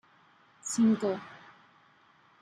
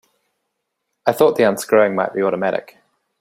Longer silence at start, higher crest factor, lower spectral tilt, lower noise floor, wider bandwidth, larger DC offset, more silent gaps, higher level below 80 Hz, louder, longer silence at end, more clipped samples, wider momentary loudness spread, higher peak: second, 0.65 s vs 1.05 s; about the same, 16 dB vs 18 dB; about the same, -5 dB/octave vs -5 dB/octave; second, -63 dBFS vs -75 dBFS; second, 12 kHz vs 16 kHz; neither; neither; second, -78 dBFS vs -64 dBFS; second, -30 LUFS vs -17 LUFS; first, 1.05 s vs 0.6 s; neither; first, 23 LU vs 8 LU; second, -16 dBFS vs -2 dBFS